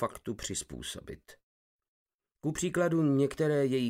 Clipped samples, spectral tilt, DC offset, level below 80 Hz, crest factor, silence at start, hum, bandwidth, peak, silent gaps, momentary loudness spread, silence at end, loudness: under 0.1%; -5.5 dB/octave; under 0.1%; -58 dBFS; 16 dB; 0 s; none; 16 kHz; -16 dBFS; 1.43-1.79 s, 1.88-2.06 s, 2.14-2.19 s; 15 LU; 0 s; -31 LUFS